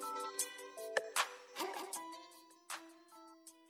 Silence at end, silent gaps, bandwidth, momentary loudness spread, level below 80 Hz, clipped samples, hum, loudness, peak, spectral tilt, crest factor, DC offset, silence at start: 0 s; none; 19 kHz; 21 LU; under -90 dBFS; under 0.1%; none; -42 LUFS; -20 dBFS; 1 dB/octave; 26 dB; under 0.1%; 0 s